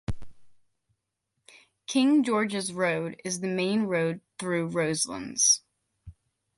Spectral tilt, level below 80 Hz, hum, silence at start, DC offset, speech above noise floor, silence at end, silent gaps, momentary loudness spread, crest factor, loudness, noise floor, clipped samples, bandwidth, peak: -3.5 dB/octave; -54 dBFS; none; 0.1 s; under 0.1%; 55 dB; 0.45 s; none; 11 LU; 20 dB; -26 LUFS; -81 dBFS; under 0.1%; 11.5 kHz; -10 dBFS